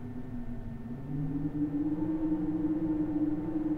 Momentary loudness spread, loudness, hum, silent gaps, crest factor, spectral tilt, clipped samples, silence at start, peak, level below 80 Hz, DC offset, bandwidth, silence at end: 10 LU; -33 LUFS; none; none; 12 dB; -11 dB/octave; under 0.1%; 0 s; -20 dBFS; -46 dBFS; under 0.1%; 3.5 kHz; 0 s